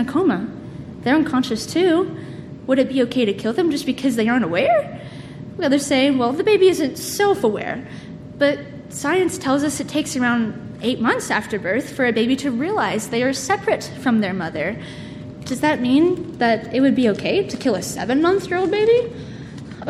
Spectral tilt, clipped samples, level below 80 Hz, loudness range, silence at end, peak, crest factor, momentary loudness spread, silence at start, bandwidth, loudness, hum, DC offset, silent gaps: -5 dB/octave; under 0.1%; -52 dBFS; 3 LU; 0 s; -4 dBFS; 16 dB; 16 LU; 0 s; 14.5 kHz; -19 LUFS; none; under 0.1%; none